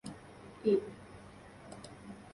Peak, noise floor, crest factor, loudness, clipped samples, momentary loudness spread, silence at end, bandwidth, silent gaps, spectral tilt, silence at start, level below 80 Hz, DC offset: -18 dBFS; -53 dBFS; 20 dB; -33 LUFS; under 0.1%; 21 LU; 0.05 s; 11.5 kHz; none; -6.5 dB/octave; 0.05 s; -66 dBFS; under 0.1%